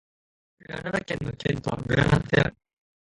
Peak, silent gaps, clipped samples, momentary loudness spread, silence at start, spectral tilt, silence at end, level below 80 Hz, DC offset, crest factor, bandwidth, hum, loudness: -6 dBFS; none; under 0.1%; 10 LU; 0.7 s; -6.5 dB/octave; 0.55 s; -44 dBFS; under 0.1%; 20 dB; 11 kHz; none; -26 LUFS